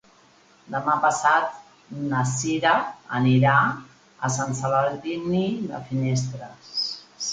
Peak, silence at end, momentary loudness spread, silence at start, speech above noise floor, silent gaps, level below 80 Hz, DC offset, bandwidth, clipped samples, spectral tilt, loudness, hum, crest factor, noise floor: -4 dBFS; 0 s; 12 LU; 0.7 s; 33 dB; none; -60 dBFS; under 0.1%; 9.4 kHz; under 0.1%; -5 dB/octave; -23 LUFS; none; 20 dB; -56 dBFS